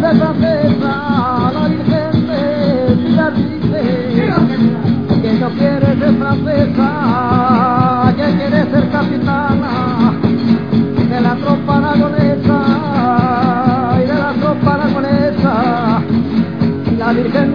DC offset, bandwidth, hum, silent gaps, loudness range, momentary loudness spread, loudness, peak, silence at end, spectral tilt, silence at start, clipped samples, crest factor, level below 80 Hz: 1%; 5.2 kHz; none; none; 1 LU; 3 LU; -13 LUFS; 0 dBFS; 0 s; -9.5 dB/octave; 0 s; under 0.1%; 12 dB; -40 dBFS